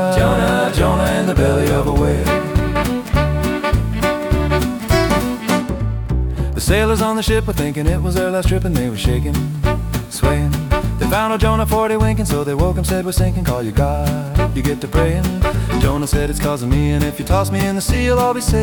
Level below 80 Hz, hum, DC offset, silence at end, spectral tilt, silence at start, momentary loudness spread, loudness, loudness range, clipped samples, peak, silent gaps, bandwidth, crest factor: -22 dBFS; none; under 0.1%; 0 s; -6 dB/octave; 0 s; 4 LU; -17 LUFS; 2 LU; under 0.1%; -2 dBFS; none; 19 kHz; 14 dB